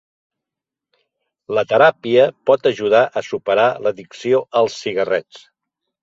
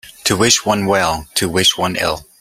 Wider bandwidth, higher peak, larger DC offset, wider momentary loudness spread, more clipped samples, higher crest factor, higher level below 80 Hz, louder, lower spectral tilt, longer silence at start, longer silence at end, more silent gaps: second, 7.8 kHz vs 16 kHz; about the same, -2 dBFS vs 0 dBFS; neither; first, 9 LU vs 6 LU; neither; about the same, 18 dB vs 16 dB; second, -64 dBFS vs -44 dBFS; about the same, -17 LUFS vs -15 LUFS; first, -5 dB/octave vs -2.5 dB/octave; first, 1.5 s vs 0.05 s; first, 0.65 s vs 0.15 s; neither